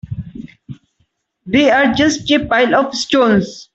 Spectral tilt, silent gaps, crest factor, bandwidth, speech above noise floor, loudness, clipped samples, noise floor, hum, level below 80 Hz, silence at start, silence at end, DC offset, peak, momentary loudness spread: -4.5 dB/octave; none; 14 dB; 8.2 kHz; 51 dB; -13 LUFS; under 0.1%; -64 dBFS; none; -44 dBFS; 0.05 s; 0.1 s; under 0.1%; 0 dBFS; 18 LU